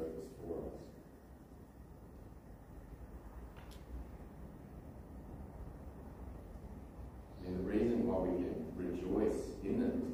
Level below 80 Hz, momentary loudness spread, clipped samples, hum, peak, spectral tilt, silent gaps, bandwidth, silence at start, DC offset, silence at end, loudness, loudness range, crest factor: -54 dBFS; 20 LU; under 0.1%; none; -24 dBFS; -8 dB/octave; none; 15.5 kHz; 0 s; under 0.1%; 0 s; -41 LUFS; 16 LU; 18 dB